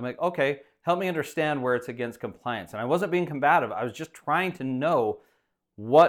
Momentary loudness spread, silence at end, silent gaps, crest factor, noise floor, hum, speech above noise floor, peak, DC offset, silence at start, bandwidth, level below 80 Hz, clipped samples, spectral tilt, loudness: 11 LU; 0 s; none; 20 dB; -71 dBFS; none; 45 dB; -6 dBFS; under 0.1%; 0 s; 16.5 kHz; -70 dBFS; under 0.1%; -6 dB/octave; -27 LUFS